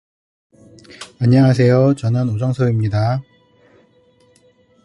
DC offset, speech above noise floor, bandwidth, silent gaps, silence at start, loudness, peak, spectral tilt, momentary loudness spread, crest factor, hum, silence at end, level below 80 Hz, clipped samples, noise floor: under 0.1%; 40 dB; 10.5 kHz; none; 1 s; -16 LUFS; -2 dBFS; -8.5 dB/octave; 11 LU; 16 dB; none; 1.65 s; -48 dBFS; under 0.1%; -54 dBFS